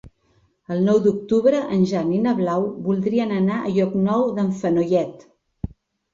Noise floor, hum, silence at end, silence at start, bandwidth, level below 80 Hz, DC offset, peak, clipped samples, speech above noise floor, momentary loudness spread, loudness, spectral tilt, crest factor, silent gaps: -62 dBFS; none; 0.45 s; 0.05 s; 7.6 kHz; -50 dBFS; under 0.1%; -6 dBFS; under 0.1%; 43 dB; 11 LU; -20 LUFS; -8 dB/octave; 16 dB; none